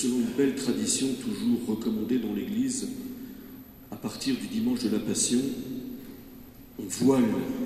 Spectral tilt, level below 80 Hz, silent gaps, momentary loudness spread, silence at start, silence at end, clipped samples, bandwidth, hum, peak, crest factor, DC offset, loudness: -4 dB/octave; -58 dBFS; none; 20 LU; 0 s; 0 s; under 0.1%; 14 kHz; none; -10 dBFS; 18 dB; under 0.1%; -28 LUFS